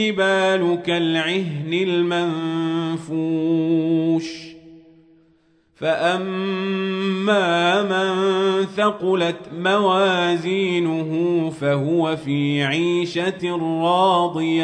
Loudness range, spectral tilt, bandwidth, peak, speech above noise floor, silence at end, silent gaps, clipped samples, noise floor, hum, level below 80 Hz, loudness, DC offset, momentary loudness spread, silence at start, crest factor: 4 LU; -6 dB/octave; 9.4 kHz; -4 dBFS; 39 dB; 0 s; none; under 0.1%; -59 dBFS; none; -66 dBFS; -20 LUFS; under 0.1%; 6 LU; 0 s; 16 dB